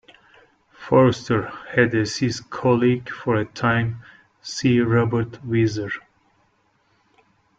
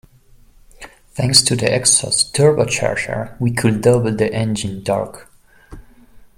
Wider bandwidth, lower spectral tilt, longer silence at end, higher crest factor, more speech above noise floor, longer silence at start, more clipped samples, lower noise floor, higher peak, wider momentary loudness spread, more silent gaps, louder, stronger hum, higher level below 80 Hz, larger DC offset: second, 7.8 kHz vs 16.5 kHz; first, -6.5 dB/octave vs -3.5 dB/octave; first, 1.6 s vs 0.1 s; about the same, 20 dB vs 18 dB; first, 44 dB vs 32 dB; about the same, 0.8 s vs 0.8 s; neither; first, -64 dBFS vs -48 dBFS; about the same, -2 dBFS vs 0 dBFS; about the same, 12 LU vs 10 LU; neither; second, -21 LUFS vs -16 LUFS; neither; second, -54 dBFS vs -46 dBFS; neither